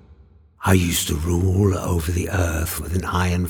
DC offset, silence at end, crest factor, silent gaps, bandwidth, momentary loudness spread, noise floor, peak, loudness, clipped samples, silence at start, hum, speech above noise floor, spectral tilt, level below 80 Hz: under 0.1%; 0 s; 18 dB; none; over 20 kHz; 6 LU; -50 dBFS; -2 dBFS; -21 LUFS; under 0.1%; 0.1 s; none; 30 dB; -5 dB/octave; -36 dBFS